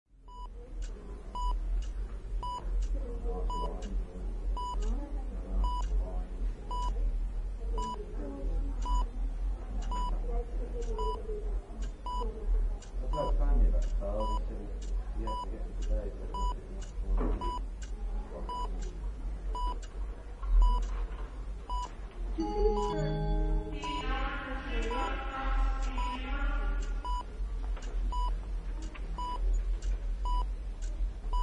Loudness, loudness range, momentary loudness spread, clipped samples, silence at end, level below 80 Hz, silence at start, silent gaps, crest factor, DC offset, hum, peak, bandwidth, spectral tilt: -37 LUFS; 4 LU; 9 LU; under 0.1%; 0 s; -32 dBFS; 0.2 s; none; 16 dB; under 0.1%; none; -16 dBFS; 8.4 kHz; -6 dB/octave